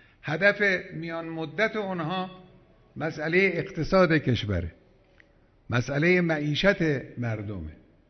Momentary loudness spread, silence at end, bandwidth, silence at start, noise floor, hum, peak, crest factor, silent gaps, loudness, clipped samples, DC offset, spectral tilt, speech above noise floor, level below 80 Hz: 12 LU; 0.35 s; 6.4 kHz; 0.25 s; -59 dBFS; none; -8 dBFS; 18 dB; none; -26 LUFS; under 0.1%; under 0.1%; -6.5 dB/octave; 33 dB; -48 dBFS